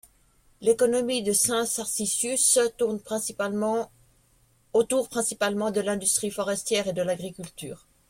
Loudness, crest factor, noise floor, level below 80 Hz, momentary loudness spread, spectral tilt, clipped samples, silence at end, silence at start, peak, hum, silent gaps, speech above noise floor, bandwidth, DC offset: -25 LUFS; 18 dB; -63 dBFS; -62 dBFS; 9 LU; -2.5 dB/octave; under 0.1%; 0.35 s; 0.6 s; -8 dBFS; none; none; 37 dB; 16.5 kHz; under 0.1%